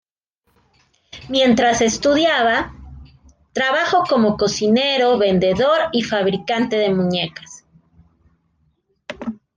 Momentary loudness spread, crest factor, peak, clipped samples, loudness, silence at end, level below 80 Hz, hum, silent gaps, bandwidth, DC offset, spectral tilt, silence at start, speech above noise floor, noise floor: 15 LU; 14 dB; -4 dBFS; under 0.1%; -17 LUFS; 0.2 s; -48 dBFS; none; none; 10 kHz; under 0.1%; -4 dB/octave; 1.15 s; 52 dB; -69 dBFS